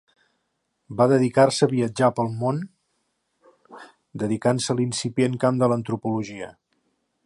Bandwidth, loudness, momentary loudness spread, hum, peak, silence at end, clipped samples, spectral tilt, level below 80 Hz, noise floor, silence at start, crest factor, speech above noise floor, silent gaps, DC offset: 11.5 kHz; -22 LUFS; 17 LU; none; -4 dBFS; 0.75 s; under 0.1%; -6 dB/octave; -64 dBFS; -75 dBFS; 0.9 s; 20 dB; 53 dB; none; under 0.1%